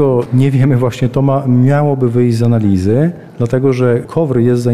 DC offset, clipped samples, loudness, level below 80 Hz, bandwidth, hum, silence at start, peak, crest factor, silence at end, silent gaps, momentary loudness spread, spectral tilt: 1%; under 0.1%; -12 LUFS; -42 dBFS; 11.5 kHz; none; 0 s; -2 dBFS; 10 dB; 0 s; none; 4 LU; -9 dB/octave